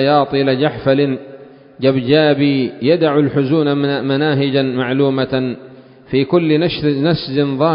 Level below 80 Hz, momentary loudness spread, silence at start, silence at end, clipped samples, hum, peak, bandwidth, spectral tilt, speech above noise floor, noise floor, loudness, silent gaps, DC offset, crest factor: -50 dBFS; 6 LU; 0 s; 0 s; under 0.1%; none; 0 dBFS; 5.4 kHz; -11 dB/octave; 24 dB; -38 dBFS; -15 LUFS; none; under 0.1%; 14 dB